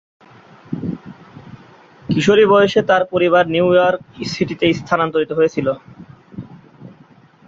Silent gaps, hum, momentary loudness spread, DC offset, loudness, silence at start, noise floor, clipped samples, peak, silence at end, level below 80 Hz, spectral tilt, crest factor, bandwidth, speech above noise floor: none; none; 21 LU; under 0.1%; -16 LUFS; 0.7 s; -48 dBFS; under 0.1%; -2 dBFS; 0.6 s; -52 dBFS; -6 dB/octave; 16 dB; 7.8 kHz; 33 dB